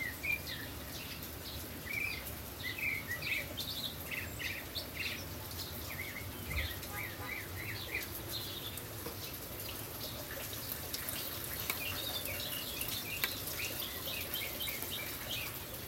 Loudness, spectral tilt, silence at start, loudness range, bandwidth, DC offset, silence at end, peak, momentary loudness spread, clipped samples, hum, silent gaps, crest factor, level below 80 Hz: -39 LUFS; -2.5 dB/octave; 0 s; 4 LU; 16.5 kHz; under 0.1%; 0 s; -12 dBFS; 6 LU; under 0.1%; none; none; 28 dB; -56 dBFS